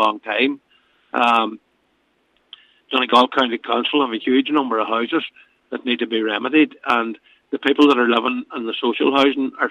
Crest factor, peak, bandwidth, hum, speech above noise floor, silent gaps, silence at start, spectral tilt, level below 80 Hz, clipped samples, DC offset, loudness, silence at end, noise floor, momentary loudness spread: 16 dB; -2 dBFS; 10 kHz; none; 46 dB; none; 0 s; -4.5 dB/octave; -68 dBFS; under 0.1%; under 0.1%; -18 LUFS; 0 s; -64 dBFS; 12 LU